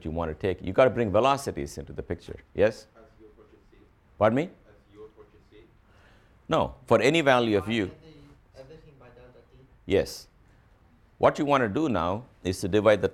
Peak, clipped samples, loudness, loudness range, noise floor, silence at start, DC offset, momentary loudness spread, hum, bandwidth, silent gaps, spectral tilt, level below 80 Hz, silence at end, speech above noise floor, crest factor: -6 dBFS; under 0.1%; -26 LUFS; 7 LU; -59 dBFS; 0.05 s; under 0.1%; 15 LU; none; 14.5 kHz; none; -5.5 dB/octave; -52 dBFS; 0.05 s; 34 dB; 20 dB